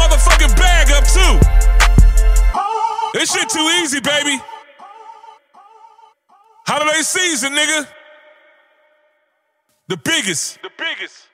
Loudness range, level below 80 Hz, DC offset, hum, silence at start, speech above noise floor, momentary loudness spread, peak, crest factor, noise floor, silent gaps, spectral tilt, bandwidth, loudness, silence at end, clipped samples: 8 LU; -16 dBFS; under 0.1%; none; 0 s; 48 dB; 12 LU; 0 dBFS; 14 dB; -66 dBFS; none; -3 dB/octave; 15 kHz; -15 LUFS; 0.25 s; under 0.1%